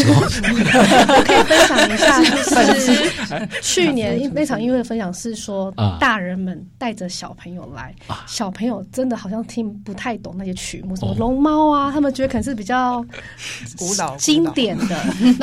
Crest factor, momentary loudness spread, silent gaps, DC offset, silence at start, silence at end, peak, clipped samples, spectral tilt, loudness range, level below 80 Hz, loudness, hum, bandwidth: 14 dB; 16 LU; none; under 0.1%; 0 s; 0 s; -2 dBFS; under 0.1%; -4 dB/octave; 13 LU; -40 dBFS; -17 LUFS; none; 16 kHz